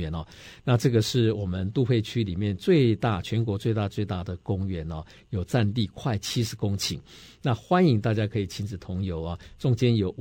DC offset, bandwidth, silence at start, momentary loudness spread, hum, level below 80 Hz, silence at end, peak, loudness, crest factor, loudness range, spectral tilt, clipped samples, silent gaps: under 0.1%; 16.5 kHz; 0 s; 12 LU; none; -48 dBFS; 0 s; -8 dBFS; -26 LUFS; 16 dB; 4 LU; -6.5 dB/octave; under 0.1%; none